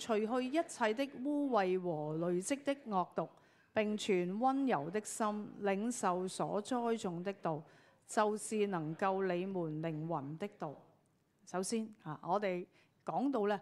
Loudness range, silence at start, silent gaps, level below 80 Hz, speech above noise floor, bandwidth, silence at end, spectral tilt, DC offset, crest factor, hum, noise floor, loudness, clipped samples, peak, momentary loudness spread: 5 LU; 0 s; none; -86 dBFS; 37 dB; 14 kHz; 0 s; -5 dB/octave; under 0.1%; 20 dB; none; -74 dBFS; -37 LUFS; under 0.1%; -18 dBFS; 9 LU